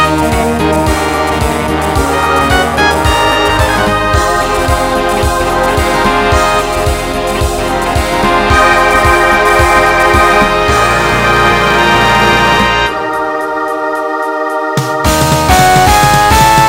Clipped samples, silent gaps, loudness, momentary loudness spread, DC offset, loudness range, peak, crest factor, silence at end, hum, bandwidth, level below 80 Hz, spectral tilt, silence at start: 0.3%; none; -9 LUFS; 7 LU; under 0.1%; 4 LU; 0 dBFS; 10 dB; 0 s; none; 16.5 kHz; -20 dBFS; -4 dB/octave; 0 s